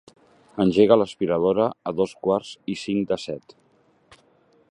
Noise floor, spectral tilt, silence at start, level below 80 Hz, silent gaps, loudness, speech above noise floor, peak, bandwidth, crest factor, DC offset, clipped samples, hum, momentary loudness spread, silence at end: -60 dBFS; -6.5 dB/octave; 0.55 s; -58 dBFS; none; -22 LUFS; 38 dB; -2 dBFS; 10.5 kHz; 22 dB; under 0.1%; under 0.1%; none; 15 LU; 1.3 s